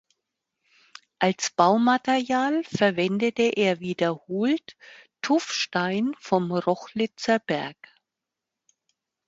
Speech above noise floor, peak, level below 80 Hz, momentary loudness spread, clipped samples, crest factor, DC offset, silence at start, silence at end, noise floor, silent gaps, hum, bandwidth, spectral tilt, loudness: 62 dB; -4 dBFS; -70 dBFS; 7 LU; under 0.1%; 22 dB; under 0.1%; 1.2 s; 1.55 s; -86 dBFS; none; none; 8 kHz; -4.5 dB/octave; -24 LUFS